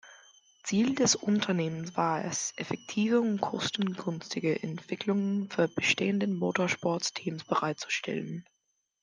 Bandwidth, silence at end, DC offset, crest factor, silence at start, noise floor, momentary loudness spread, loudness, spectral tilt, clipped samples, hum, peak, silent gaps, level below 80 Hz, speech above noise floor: 10 kHz; 0.6 s; under 0.1%; 18 dB; 0.05 s; -79 dBFS; 9 LU; -30 LUFS; -4 dB/octave; under 0.1%; none; -12 dBFS; none; -72 dBFS; 49 dB